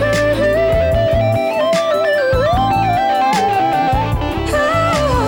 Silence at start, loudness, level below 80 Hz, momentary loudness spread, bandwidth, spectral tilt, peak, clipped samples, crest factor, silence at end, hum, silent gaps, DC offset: 0 s; -15 LUFS; -28 dBFS; 2 LU; 18.5 kHz; -5.5 dB/octave; -6 dBFS; under 0.1%; 8 dB; 0 s; none; none; under 0.1%